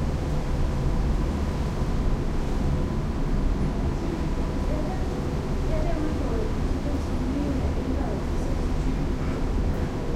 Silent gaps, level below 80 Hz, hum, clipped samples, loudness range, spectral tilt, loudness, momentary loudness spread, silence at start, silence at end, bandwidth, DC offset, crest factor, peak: none; -28 dBFS; none; under 0.1%; 1 LU; -7.5 dB/octave; -28 LUFS; 2 LU; 0 s; 0 s; 12 kHz; under 0.1%; 12 dB; -12 dBFS